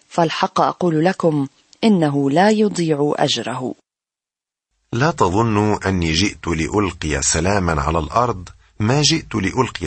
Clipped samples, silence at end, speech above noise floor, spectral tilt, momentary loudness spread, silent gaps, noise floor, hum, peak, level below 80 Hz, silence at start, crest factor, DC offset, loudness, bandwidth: under 0.1%; 0 s; 71 dB; -4.5 dB/octave; 7 LU; none; -89 dBFS; none; -2 dBFS; -38 dBFS; 0.1 s; 16 dB; under 0.1%; -18 LUFS; 8.8 kHz